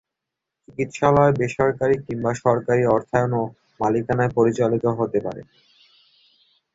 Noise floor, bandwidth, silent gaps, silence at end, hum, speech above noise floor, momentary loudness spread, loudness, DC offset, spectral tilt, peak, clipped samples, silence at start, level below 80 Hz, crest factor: -84 dBFS; 8 kHz; none; 1.3 s; none; 63 dB; 11 LU; -21 LUFS; under 0.1%; -7.5 dB/octave; -2 dBFS; under 0.1%; 0.7 s; -52 dBFS; 20 dB